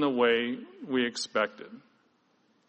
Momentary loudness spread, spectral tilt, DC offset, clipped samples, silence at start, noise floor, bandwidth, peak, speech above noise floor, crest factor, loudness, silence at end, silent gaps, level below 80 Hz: 18 LU; -3.5 dB/octave; under 0.1%; under 0.1%; 0 s; -69 dBFS; 8.2 kHz; -12 dBFS; 40 dB; 18 dB; -29 LUFS; 0.9 s; none; -78 dBFS